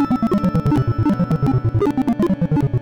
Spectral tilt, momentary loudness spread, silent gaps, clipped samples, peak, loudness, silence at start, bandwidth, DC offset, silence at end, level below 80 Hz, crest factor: -9.5 dB/octave; 1 LU; none; under 0.1%; -10 dBFS; -18 LUFS; 0 s; 15.5 kHz; under 0.1%; 0 s; -36 dBFS; 8 dB